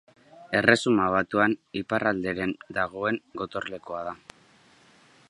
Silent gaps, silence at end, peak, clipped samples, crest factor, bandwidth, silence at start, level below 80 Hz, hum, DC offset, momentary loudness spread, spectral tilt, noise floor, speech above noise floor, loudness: none; 1.15 s; -2 dBFS; under 0.1%; 26 dB; 11.5 kHz; 0.35 s; -60 dBFS; none; under 0.1%; 14 LU; -5 dB/octave; -58 dBFS; 32 dB; -26 LUFS